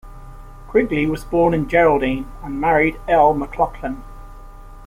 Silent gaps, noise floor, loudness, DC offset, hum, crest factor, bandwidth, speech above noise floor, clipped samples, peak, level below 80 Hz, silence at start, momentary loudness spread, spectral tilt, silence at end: none; -37 dBFS; -18 LUFS; under 0.1%; none; 16 dB; 16 kHz; 20 dB; under 0.1%; -2 dBFS; -34 dBFS; 0.05 s; 13 LU; -7.5 dB/octave; 0 s